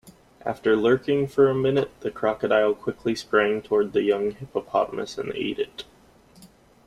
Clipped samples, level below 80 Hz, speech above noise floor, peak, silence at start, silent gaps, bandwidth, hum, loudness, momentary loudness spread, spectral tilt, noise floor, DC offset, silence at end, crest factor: under 0.1%; -58 dBFS; 31 dB; -6 dBFS; 0.05 s; none; 12 kHz; none; -24 LUFS; 11 LU; -6 dB/octave; -54 dBFS; under 0.1%; 0.4 s; 18 dB